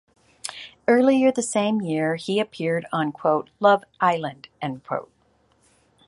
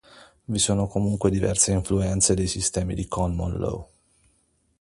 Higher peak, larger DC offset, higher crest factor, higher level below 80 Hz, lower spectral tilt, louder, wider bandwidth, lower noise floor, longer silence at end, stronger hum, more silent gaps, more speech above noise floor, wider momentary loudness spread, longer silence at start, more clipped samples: about the same, -4 dBFS vs -4 dBFS; neither; about the same, 20 dB vs 22 dB; second, -68 dBFS vs -38 dBFS; about the same, -5 dB/octave vs -4.5 dB/octave; about the same, -22 LUFS vs -23 LUFS; about the same, 11.5 kHz vs 11.5 kHz; second, -63 dBFS vs -67 dBFS; about the same, 1.05 s vs 1 s; neither; neither; about the same, 41 dB vs 43 dB; first, 15 LU vs 9 LU; first, 0.45 s vs 0.15 s; neither